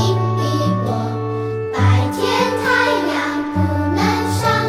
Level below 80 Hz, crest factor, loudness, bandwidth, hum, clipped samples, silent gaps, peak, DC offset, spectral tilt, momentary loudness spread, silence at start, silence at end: -46 dBFS; 14 dB; -18 LUFS; 15 kHz; none; under 0.1%; none; -4 dBFS; under 0.1%; -6 dB/octave; 7 LU; 0 s; 0 s